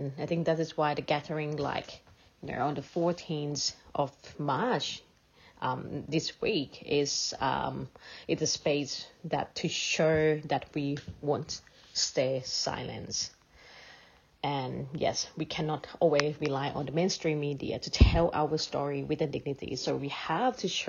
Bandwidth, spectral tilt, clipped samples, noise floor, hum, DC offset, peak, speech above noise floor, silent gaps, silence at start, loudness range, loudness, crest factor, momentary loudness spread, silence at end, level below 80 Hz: 7.4 kHz; -4.5 dB/octave; under 0.1%; -60 dBFS; none; under 0.1%; -6 dBFS; 29 dB; none; 0 s; 4 LU; -31 LUFS; 26 dB; 10 LU; 0 s; -42 dBFS